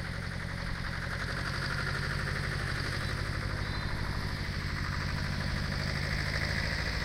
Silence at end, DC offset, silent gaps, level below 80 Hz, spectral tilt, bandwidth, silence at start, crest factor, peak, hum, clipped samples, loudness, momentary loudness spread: 0 s; under 0.1%; none; -40 dBFS; -5 dB/octave; 16 kHz; 0 s; 16 dB; -18 dBFS; none; under 0.1%; -34 LUFS; 4 LU